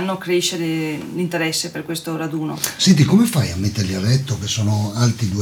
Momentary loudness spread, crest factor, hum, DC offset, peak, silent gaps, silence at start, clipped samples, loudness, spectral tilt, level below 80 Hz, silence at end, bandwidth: 10 LU; 16 dB; none; under 0.1%; -4 dBFS; none; 0 s; under 0.1%; -19 LUFS; -5 dB/octave; -48 dBFS; 0 s; 19 kHz